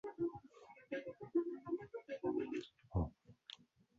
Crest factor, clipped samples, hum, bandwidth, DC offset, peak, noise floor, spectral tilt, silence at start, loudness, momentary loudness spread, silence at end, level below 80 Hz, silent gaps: 18 dB; under 0.1%; none; 7.4 kHz; under 0.1%; -26 dBFS; -62 dBFS; -6.5 dB/octave; 0.05 s; -44 LUFS; 18 LU; 0.45 s; -58 dBFS; none